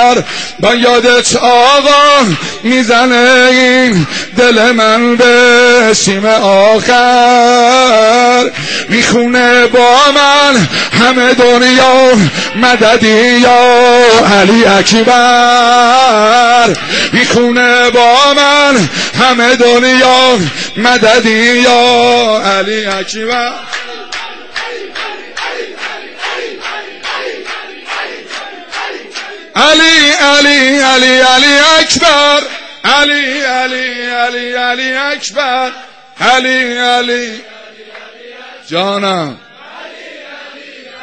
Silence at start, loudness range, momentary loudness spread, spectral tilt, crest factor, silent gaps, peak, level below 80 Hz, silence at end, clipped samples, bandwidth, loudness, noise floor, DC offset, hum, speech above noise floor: 0 s; 14 LU; 15 LU; -3 dB/octave; 8 dB; none; 0 dBFS; -44 dBFS; 0 s; under 0.1%; 9.2 kHz; -7 LUFS; -32 dBFS; under 0.1%; none; 25 dB